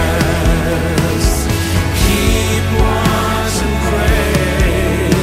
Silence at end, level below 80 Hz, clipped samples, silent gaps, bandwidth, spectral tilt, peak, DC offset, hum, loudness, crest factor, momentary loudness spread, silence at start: 0 s; -18 dBFS; under 0.1%; none; 16 kHz; -5 dB/octave; 0 dBFS; under 0.1%; none; -14 LUFS; 12 dB; 2 LU; 0 s